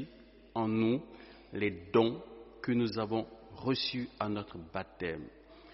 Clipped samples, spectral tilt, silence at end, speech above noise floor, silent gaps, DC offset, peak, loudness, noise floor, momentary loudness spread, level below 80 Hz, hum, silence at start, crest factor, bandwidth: under 0.1%; -4.5 dB/octave; 0 s; 23 dB; none; under 0.1%; -14 dBFS; -34 LUFS; -56 dBFS; 17 LU; -62 dBFS; none; 0 s; 22 dB; 5.8 kHz